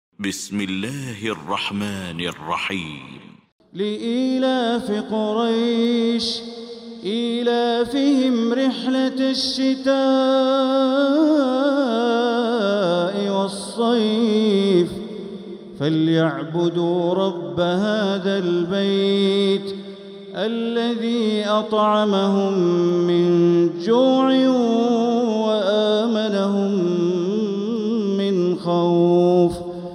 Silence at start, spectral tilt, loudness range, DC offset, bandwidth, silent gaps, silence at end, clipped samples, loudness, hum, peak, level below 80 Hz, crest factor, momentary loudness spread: 0.2 s; -6 dB/octave; 5 LU; under 0.1%; 13.5 kHz; 3.52-3.59 s; 0 s; under 0.1%; -20 LUFS; none; -6 dBFS; -60 dBFS; 14 dB; 10 LU